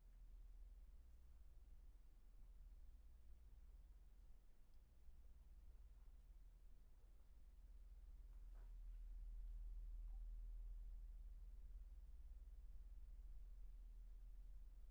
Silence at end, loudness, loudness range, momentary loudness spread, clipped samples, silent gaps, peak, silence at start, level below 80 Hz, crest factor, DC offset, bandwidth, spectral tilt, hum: 0 s; -64 LUFS; 9 LU; 10 LU; under 0.1%; none; -46 dBFS; 0 s; -58 dBFS; 12 dB; under 0.1%; 4.1 kHz; -7.5 dB/octave; none